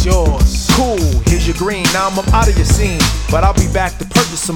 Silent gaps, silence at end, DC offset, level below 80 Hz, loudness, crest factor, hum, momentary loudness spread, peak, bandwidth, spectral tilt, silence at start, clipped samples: none; 0 s; under 0.1%; -16 dBFS; -14 LUFS; 12 dB; none; 3 LU; 0 dBFS; 18.5 kHz; -4.5 dB/octave; 0 s; under 0.1%